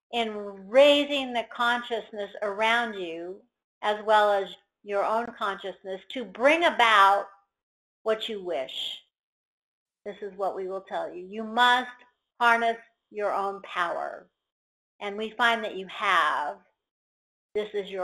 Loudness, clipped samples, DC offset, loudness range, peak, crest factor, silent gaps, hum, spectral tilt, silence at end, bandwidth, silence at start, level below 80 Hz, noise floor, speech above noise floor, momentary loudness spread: -26 LUFS; under 0.1%; under 0.1%; 8 LU; -6 dBFS; 22 dB; 3.64-3.81 s, 7.63-8.05 s, 9.19-9.86 s, 14.52-14.99 s, 16.91-17.49 s; none; -3 dB/octave; 0 s; 13 kHz; 0.1 s; -72 dBFS; under -90 dBFS; over 64 dB; 18 LU